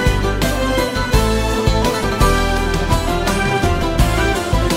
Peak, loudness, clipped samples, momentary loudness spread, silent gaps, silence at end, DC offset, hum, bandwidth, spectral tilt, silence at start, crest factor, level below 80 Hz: 0 dBFS; -17 LUFS; under 0.1%; 2 LU; none; 0 s; under 0.1%; none; 16.5 kHz; -5 dB/octave; 0 s; 14 dB; -20 dBFS